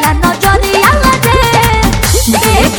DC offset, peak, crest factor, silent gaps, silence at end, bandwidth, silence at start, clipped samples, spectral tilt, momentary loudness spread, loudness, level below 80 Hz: under 0.1%; 0 dBFS; 8 dB; none; 0 s; over 20 kHz; 0 s; 1%; -4 dB/octave; 2 LU; -8 LUFS; -16 dBFS